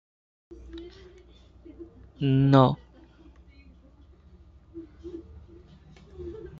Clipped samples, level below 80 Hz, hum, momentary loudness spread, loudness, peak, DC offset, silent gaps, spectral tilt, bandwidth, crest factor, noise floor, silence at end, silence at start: under 0.1%; -52 dBFS; none; 28 LU; -22 LUFS; -6 dBFS; under 0.1%; none; -9.5 dB/octave; 5.2 kHz; 24 dB; -54 dBFS; 0.05 s; 0.5 s